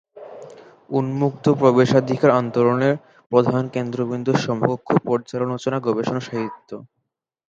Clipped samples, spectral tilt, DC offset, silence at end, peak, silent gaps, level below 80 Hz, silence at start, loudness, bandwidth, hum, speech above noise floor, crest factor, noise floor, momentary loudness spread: under 0.1%; -7.5 dB/octave; under 0.1%; 0.65 s; 0 dBFS; 3.26-3.30 s; -62 dBFS; 0.15 s; -20 LUFS; 7.6 kHz; none; 58 dB; 20 dB; -78 dBFS; 17 LU